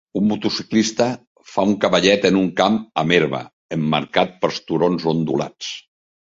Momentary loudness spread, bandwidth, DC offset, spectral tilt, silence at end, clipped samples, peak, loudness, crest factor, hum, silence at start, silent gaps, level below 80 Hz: 12 LU; 7.8 kHz; under 0.1%; -5 dB/octave; 0.5 s; under 0.1%; 0 dBFS; -19 LUFS; 18 dB; none; 0.15 s; 1.27-1.35 s, 3.53-3.69 s; -56 dBFS